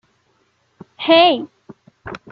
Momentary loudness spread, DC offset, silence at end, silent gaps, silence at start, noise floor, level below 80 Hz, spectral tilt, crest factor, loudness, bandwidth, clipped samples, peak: 24 LU; under 0.1%; 0.15 s; none; 1 s; -63 dBFS; -60 dBFS; -6 dB/octave; 18 dB; -14 LUFS; 6 kHz; under 0.1%; -2 dBFS